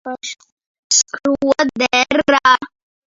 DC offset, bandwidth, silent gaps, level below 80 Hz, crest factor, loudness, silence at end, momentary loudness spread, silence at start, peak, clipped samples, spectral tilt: under 0.1%; 7.8 kHz; 0.52-0.57 s, 0.66-0.90 s; -54 dBFS; 18 dB; -15 LUFS; 0.4 s; 16 LU; 0.05 s; 0 dBFS; under 0.1%; -1 dB/octave